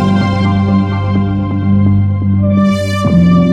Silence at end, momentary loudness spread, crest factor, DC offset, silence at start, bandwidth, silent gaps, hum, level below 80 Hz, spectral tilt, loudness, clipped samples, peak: 0 s; 4 LU; 10 dB; under 0.1%; 0 s; 9.8 kHz; none; none; -34 dBFS; -8 dB/octave; -12 LUFS; under 0.1%; 0 dBFS